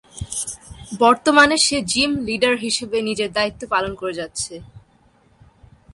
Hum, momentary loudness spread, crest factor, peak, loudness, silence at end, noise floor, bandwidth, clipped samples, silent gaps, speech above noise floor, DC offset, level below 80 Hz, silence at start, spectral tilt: none; 15 LU; 18 dB; -2 dBFS; -19 LUFS; 1.15 s; -56 dBFS; 11.5 kHz; under 0.1%; none; 37 dB; under 0.1%; -48 dBFS; 0.15 s; -2.5 dB/octave